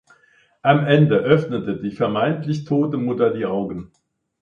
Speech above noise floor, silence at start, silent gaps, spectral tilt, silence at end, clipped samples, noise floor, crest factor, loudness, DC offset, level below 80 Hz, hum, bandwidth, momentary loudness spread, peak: 39 dB; 0.65 s; none; -8.5 dB/octave; 0.55 s; under 0.1%; -57 dBFS; 20 dB; -20 LUFS; under 0.1%; -56 dBFS; none; 7 kHz; 10 LU; 0 dBFS